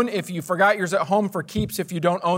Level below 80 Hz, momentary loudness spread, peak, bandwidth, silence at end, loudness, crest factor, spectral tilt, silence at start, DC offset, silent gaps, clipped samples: -50 dBFS; 8 LU; -6 dBFS; 16 kHz; 0 s; -22 LUFS; 16 dB; -5.5 dB/octave; 0 s; under 0.1%; none; under 0.1%